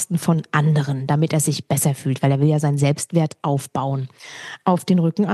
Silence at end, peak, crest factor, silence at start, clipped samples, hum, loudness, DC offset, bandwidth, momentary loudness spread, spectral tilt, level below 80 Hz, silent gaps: 0 s; -4 dBFS; 16 dB; 0 s; under 0.1%; none; -20 LUFS; under 0.1%; 12.5 kHz; 7 LU; -6 dB/octave; -64 dBFS; none